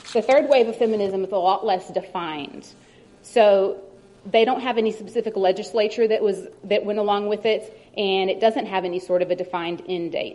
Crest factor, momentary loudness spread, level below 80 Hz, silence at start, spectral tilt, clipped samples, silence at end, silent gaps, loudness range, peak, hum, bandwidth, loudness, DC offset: 18 dB; 11 LU; -66 dBFS; 0.05 s; -5 dB/octave; under 0.1%; 0 s; none; 2 LU; -4 dBFS; none; 11.5 kHz; -22 LUFS; under 0.1%